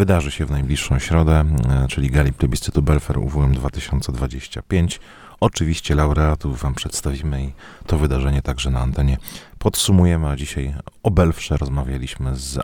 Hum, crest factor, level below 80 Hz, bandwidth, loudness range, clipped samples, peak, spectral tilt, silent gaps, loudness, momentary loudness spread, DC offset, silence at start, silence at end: none; 18 dB; -24 dBFS; 18.5 kHz; 3 LU; under 0.1%; -2 dBFS; -6 dB/octave; none; -20 LUFS; 9 LU; under 0.1%; 0 s; 0 s